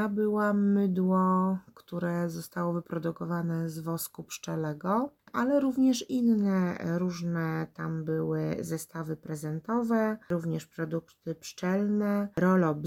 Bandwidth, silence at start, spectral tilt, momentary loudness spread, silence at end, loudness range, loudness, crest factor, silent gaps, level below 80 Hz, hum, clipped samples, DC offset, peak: 17 kHz; 0 s; -7 dB/octave; 10 LU; 0 s; 4 LU; -30 LUFS; 16 dB; none; -68 dBFS; none; under 0.1%; under 0.1%; -14 dBFS